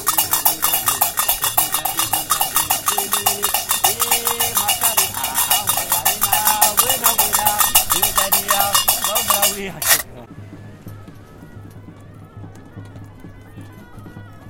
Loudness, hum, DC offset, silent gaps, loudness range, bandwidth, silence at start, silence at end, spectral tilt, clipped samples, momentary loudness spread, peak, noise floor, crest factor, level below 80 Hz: -15 LUFS; none; under 0.1%; none; 6 LU; 18 kHz; 0 s; 0 s; 0 dB/octave; under 0.1%; 4 LU; 0 dBFS; -39 dBFS; 20 dB; -44 dBFS